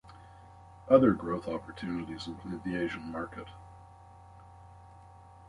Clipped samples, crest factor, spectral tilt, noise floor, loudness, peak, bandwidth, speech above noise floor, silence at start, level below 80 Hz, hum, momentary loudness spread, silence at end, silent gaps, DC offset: under 0.1%; 26 dB; -7.5 dB/octave; -53 dBFS; -31 LUFS; -8 dBFS; 11 kHz; 23 dB; 0.05 s; -58 dBFS; none; 28 LU; 0.05 s; none; under 0.1%